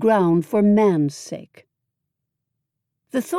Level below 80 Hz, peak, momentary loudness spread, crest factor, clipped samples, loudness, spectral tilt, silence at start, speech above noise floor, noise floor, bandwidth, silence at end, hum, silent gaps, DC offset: -72 dBFS; -8 dBFS; 18 LU; 14 dB; under 0.1%; -19 LUFS; -7.5 dB/octave; 0 s; 62 dB; -80 dBFS; 15 kHz; 0 s; none; none; under 0.1%